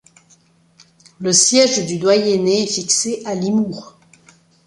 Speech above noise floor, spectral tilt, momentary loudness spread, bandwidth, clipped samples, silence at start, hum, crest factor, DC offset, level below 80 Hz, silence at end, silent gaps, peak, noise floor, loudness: 38 dB; -3 dB/octave; 11 LU; 11.5 kHz; under 0.1%; 1.2 s; none; 18 dB; under 0.1%; -62 dBFS; 0.8 s; none; 0 dBFS; -54 dBFS; -16 LUFS